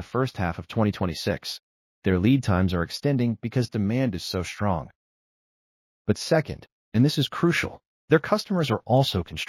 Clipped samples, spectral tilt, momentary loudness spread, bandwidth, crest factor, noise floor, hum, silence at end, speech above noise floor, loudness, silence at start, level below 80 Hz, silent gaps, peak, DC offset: under 0.1%; -6 dB/octave; 9 LU; 14.5 kHz; 20 dB; under -90 dBFS; none; 0.05 s; over 66 dB; -25 LUFS; 0 s; -50 dBFS; 1.63-2.02 s, 4.95-6.05 s, 6.72-6.92 s, 7.87-8.08 s; -6 dBFS; under 0.1%